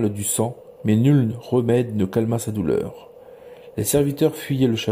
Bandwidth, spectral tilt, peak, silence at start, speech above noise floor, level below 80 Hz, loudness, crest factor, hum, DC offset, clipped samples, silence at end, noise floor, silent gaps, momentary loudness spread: 16 kHz; -6 dB/octave; -6 dBFS; 0 s; 23 dB; -52 dBFS; -21 LUFS; 16 dB; none; under 0.1%; under 0.1%; 0 s; -43 dBFS; none; 8 LU